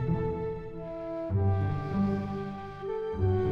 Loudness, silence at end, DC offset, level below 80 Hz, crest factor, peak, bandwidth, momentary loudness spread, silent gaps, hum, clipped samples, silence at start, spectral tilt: -32 LUFS; 0 s; under 0.1%; -48 dBFS; 14 dB; -16 dBFS; 5.4 kHz; 10 LU; none; none; under 0.1%; 0 s; -10 dB/octave